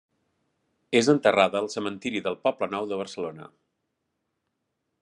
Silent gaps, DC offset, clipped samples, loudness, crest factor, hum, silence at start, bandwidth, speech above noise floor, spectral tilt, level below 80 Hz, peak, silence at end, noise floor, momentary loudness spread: none; under 0.1%; under 0.1%; -25 LUFS; 24 dB; none; 0.9 s; 11 kHz; 54 dB; -4.5 dB/octave; -74 dBFS; -4 dBFS; 1.55 s; -79 dBFS; 12 LU